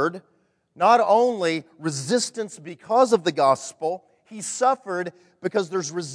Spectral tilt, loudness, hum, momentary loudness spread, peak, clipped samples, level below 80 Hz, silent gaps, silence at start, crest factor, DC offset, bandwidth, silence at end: -4 dB/octave; -22 LUFS; none; 15 LU; -4 dBFS; under 0.1%; -76 dBFS; none; 0 s; 18 dB; under 0.1%; 11 kHz; 0 s